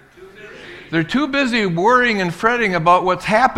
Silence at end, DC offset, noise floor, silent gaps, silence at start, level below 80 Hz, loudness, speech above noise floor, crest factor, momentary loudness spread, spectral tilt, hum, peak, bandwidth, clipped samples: 0 s; under 0.1%; -40 dBFS; none; 0.2 s; -48 dBFS; -16 LUFS; 24 dB; 18 dB; 11 LU; -5.5 dB/octave; none; 0 dBFS; 14 kHz; under 0.1%